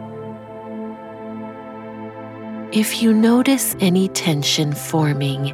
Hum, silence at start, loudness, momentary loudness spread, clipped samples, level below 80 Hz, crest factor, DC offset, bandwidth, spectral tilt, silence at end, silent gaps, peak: none; 0 s; -17 LUFS; 18 LU; under 0.1%; -58 dBFS; 14 dB; under 0.1%; 17 kHz; -4.5 dB/octave; 0 s; none; -4 dBFS